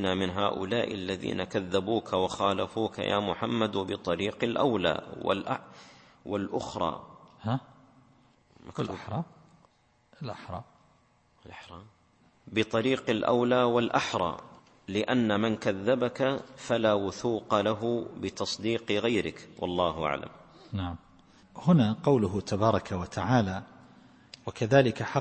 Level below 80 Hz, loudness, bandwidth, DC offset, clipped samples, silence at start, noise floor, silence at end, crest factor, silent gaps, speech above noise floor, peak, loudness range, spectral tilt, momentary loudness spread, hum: -60 dBFS; -29 LUFS; 8.8 kHz; under 0.1%; under 0.1%; 0 s; -65 dBFS; 0 s; 22 dB; none; 37 dB; -8 dBFS; 11 LU; -6 dB/octave; 15 LU; none